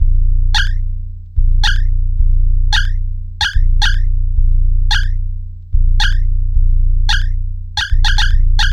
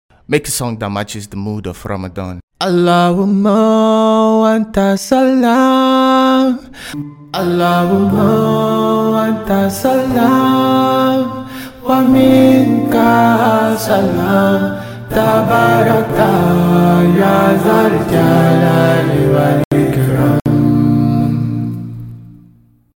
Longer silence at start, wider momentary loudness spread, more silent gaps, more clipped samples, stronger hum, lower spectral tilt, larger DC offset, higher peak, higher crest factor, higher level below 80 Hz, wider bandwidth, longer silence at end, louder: second, 0 s vs 0.3 s; second, 8 LU vs 13 LU; second, none vs 2.43-2.48 s, 19.65-19.71 s; neither; neither; second, -2.5 dB/octave vs -6.5 dB/octave; neither; about the same, -2 dBFS vs 0 dBFS; about the same, 10 dB vs 12 dB; first, -12 dBFS vs -40 dBFS; second, 7.2 kHz vs 17 kHz; second, 0 s vs 0.7 s; second, -17 LUFS vs -12 LUFS